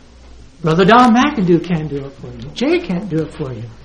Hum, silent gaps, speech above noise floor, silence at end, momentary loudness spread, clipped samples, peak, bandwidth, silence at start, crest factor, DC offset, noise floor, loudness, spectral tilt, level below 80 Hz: none; none; 25 dB; 0.05 s; 18 LU; under 0.1%; 0 dBFS; 10 kHz; 0.35 s; 16 dB; under 0.1%; -39 dBFS; -14 LUFS; -6.5 dB/octave; -40 dBFS